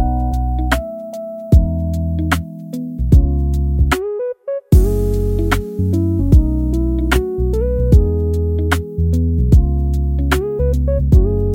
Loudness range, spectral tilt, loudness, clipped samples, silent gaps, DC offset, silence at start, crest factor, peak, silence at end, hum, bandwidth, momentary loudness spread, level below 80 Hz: 2 LU; -7.5 dB/octave; -17 LUFS; under 0.1%; none; under 0.1%; 0 s; 14 dB; 0 dBFS; 0 s; none; 16.5 kHz; 9 LU; -18 dBFS